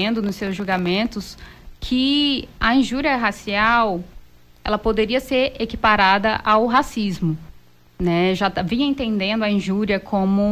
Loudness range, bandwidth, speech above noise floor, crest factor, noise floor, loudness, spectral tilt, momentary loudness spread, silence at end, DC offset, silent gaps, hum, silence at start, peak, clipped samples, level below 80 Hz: 2 LU; 15.5 kHz; 28 dB; 14 dB; -48 dBFS; -19 LUFS; -5.5 dB/octave; 9 LU; 0 s; under 0.1%; none; none; 0 s; -6 dBFS; under 0.1%; -40 dBFS